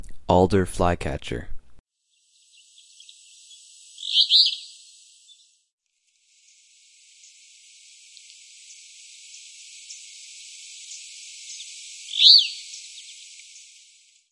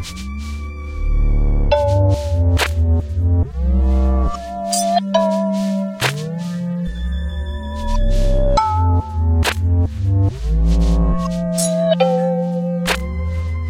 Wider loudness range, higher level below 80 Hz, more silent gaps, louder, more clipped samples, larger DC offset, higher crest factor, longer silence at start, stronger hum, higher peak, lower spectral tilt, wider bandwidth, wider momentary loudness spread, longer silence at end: first, 22 LU vs 3 LU; second, -46 dBFS vs -20 dBFS; first, 1.79-1.84 s, 5.72-5.78 s vs none; about the same, -18 LUFS vs -19 LUFS; neither; neither; first, 26 dB vs 14 dB; about the same, 0 s vs 0 s; neither; about the same, -2 dBFS vs -2 dBFS; second, -3.5 dB/octave vs -6 dB/octave; second, 11.5 kHz vs 16 kHz; first, 28 LU vs 8 LU; first, 1.2 s vs 0 s